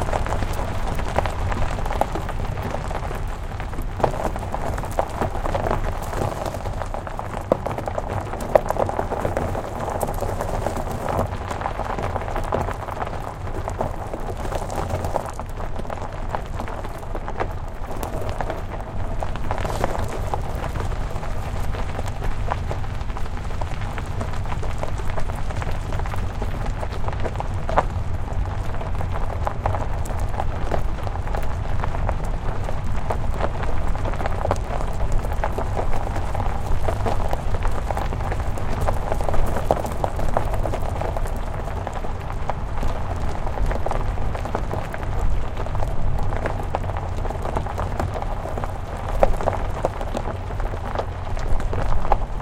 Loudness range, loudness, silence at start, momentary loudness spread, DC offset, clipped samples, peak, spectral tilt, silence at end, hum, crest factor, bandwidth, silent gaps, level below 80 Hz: 4 LU; -27 LUFS; 0 s; 6 LU; under 0.1%; under 0.1%; 0 dBFS; -6.5 dB/octave; 0 s; none; 22 dB; 15 kHz; none; -26 dBFS